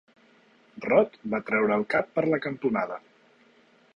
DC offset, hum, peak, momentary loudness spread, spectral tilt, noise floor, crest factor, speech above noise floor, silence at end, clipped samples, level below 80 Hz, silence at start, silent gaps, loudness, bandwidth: under 0.1%; none; -8 dBFS; 10 LU; -8 dB/octave; -60 dBFS; 20 dB; 35 dB; 0.95 s; under 0.1%; -66 dBFS; 0.75 s; none; -26 LUFS; 9.8 kHz